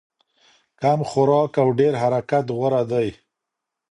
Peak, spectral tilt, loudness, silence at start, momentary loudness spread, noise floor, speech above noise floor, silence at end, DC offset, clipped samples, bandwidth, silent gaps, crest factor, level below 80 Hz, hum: -4 dBFS; -7.5 dB/octave; -20 LUFS; 0.8 s; 6 LU; -83 dBFS; 64 dB; 0.8 s; under 0.1%; under 0.1%; 10.5 kHz; none; 16 dB; -60 dBFS; none